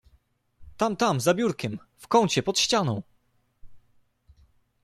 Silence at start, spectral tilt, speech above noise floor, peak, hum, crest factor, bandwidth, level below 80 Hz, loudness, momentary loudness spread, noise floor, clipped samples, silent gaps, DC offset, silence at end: 0.6 s; -4 dB/octave; 43 dB; -8 dBFS; none; 20 dB; 14 kHz; -58 dBFS; -25 LUFS; 12 LU; -68 dBFS; under 0.1%; none; under 0.1%; 1.05 s